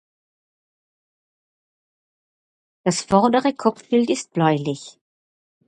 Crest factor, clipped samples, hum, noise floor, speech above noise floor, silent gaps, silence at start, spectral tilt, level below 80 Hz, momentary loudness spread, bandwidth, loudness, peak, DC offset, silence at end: 22 dB; under 0.1%; none; under -90 dBFS; over 70 dB; none; 2.85 s; -5.5 dB/octave; -62 dBFS; 9 LU; 11 kHz; -20 LUFS; -2 dBFS; under 0.1%; 0.75 s